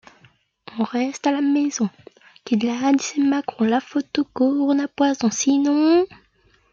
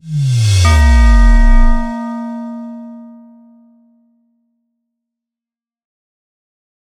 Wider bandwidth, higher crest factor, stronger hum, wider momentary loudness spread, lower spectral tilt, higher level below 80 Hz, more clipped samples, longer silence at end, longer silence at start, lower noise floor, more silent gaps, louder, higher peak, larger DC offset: second, 7.6 kHz vs 11.5 kHz; about the same, 16 dB vs 14 dB; neither; second, 8 LU vs 20 LU; second, -4 dB/octave vs -5.5 dB/octave; second, -66 dBFS vs -14 dBFS; neither; second, 0.65 s vs 3.8 s; first, 0.7 s vs 0.05 s; second, -60 dBFS vs -90 dBFS; neither; second, -21 LUFS vs -13 LUFS; second, -4 dBFS vs 0 dBFS; neither